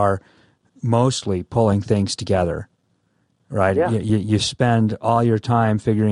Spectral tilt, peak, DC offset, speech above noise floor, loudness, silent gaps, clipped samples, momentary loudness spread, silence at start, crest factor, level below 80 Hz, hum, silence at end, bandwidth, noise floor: -6.5 dB/octave; -2 dBFS; under 0.1%; 47 dB; -20 LUFS; none; under 0.1%; 6 LU; 0 s; 16 dB; -48 dBFS; none; 0 s; 10.5 kHz; -65 dBFS